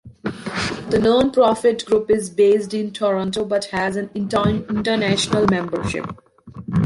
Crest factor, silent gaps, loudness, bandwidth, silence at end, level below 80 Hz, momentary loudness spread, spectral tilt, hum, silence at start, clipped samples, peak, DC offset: 16 dB; none; -19 LUFS; 11.5 kHz; 0 s; -44 dBFS; 10 LU; -5.5 dB/octave; none; 0.05 s; under 0.1%; -2 dBFS; under 0.1%